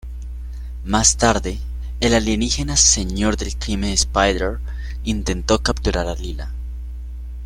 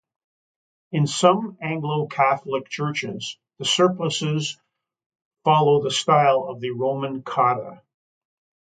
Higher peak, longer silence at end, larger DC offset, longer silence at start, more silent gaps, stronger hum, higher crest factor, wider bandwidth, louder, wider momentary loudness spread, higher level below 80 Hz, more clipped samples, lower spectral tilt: first, 0 dBFS vs -4 dBFS; second, 0 s vs 1 s; neither; second, 0.05 s vs 0.9 s; second, none vs 5.06-5.10 s, 5.22-5.31 s; neither; about the same, 20 dB vs 20 dB; first, 14 kHz vs 9.4 kHz; first, -19 LUFS vs -22 LUFS; first, 19 LU vs 12 LU; first, -26 dBFS vs -70 dBFS; neither; second, -3 dB/octave vs -4.5 dB/octave